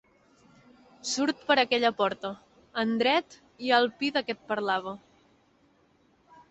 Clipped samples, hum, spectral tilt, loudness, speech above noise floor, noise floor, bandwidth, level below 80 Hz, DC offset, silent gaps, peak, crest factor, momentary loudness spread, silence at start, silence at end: under 0.1%; none; -3 dB/octave; -27 LUFS; 38 dB; -65 dBFS; 8.4 kHz; -72 dBFS; under 0.1%; none; -8 dBFS; 22 dB; 14 LU; 1.05 s; 1.55 s